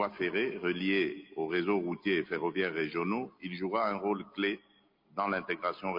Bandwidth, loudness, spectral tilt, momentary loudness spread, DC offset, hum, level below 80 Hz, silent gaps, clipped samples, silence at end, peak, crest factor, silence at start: 5.4 kHz; -33 LUFS; -8 dB/octave; 6 LU; under 0.1%; none; -74 dBFS; none; under 0.1%; 0 s; -16 dBFS; 16 dB; 0 s